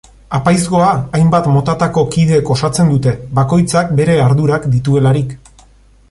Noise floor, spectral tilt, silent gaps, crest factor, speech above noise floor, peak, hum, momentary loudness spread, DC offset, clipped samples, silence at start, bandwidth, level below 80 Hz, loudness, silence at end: -45 dBFS; -7 dB/octave; none; 12 dB; 34 dB; 0 dBFS; none; 4 LU; under 0.1%; under 0.1%; 0.3 s; 11.5 kHz; -38 dBFS; -13 LUFS; 0.75 s